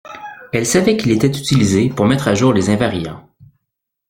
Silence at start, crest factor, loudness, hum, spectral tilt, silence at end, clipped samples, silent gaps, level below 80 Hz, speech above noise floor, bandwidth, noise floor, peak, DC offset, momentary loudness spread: 0.05 s; 14 dB; -15 LUFS; none; -5.5 dB/octave; 0.9 s; under 0.1%; none; -44 dBFS; 63 dB; 16.5 kHz; -77 dBFS; -2 dBFS; under 0.1%; 11 LU